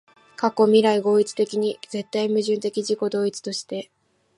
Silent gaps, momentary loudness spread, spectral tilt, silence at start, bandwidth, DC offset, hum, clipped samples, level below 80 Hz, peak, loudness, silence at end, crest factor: none; 13 LU; -5 dB/octave; 0.4 s; 11.5 kHz; under 0.1%; none; under 0.1%; -76 dBFS; -4 dBFS; -22 LUFS; 0.55 s; 18 dB